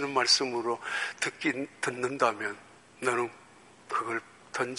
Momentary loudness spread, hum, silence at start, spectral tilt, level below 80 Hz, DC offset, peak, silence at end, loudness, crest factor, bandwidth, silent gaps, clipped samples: 13 LU; none; 0 s; -2 dB/octave; -76 dBFS; under 0.1%; -10 dBFS; 0 s; -30 LUFS; 22 dB; 11.5 kHz; none; under 0.1%